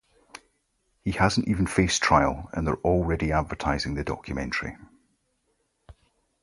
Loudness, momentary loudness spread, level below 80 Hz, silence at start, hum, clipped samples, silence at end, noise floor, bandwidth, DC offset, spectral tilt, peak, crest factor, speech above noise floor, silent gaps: -25 LUFS; 11 LU; -40 dBFS; 1.05 s; none; under 0.1%; 0.5 s; -73 dBFS; 11.5 kHz; under 0.1%; -5 dB/octave; -4 dBFS; 22 dB; 48 dB; none